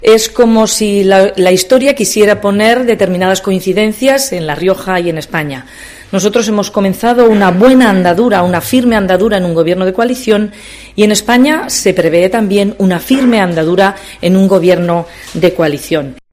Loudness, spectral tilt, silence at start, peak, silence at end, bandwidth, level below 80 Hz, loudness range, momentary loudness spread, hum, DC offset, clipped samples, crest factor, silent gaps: -10 LUFS; -5 dB/octave; 0 s; 0 dBFS; 0.2 s; 16 kHz; -40 dBFS; 4 LU; 8 LU; none; under 0.1%; 1%; 10 dB; none